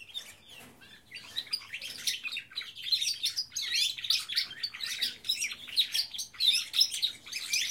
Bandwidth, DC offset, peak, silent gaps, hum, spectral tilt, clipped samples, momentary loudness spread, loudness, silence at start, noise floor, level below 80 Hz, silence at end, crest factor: 16.5 kHz; under 0.1%; -12 dBFS; none; none; 2.5 dB/octave; under 0.1%; 16 LU; -30 LUFS; 0 s; -54 dBFS; -74 dBFS; 0 s; 22 dB